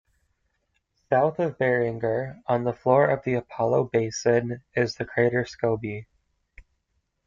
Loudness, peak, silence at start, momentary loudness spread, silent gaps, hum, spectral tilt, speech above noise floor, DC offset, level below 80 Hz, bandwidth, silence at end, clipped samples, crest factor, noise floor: -25 LUFS; -6 dBFS; 1.1 s; 7 LU; none; none; -6 dB/octave; 51 dB; under 0.1%; -60 dBFS; 7.6 kHz; 0.65 s; under 0.1%; 20 dB; -75 dBFS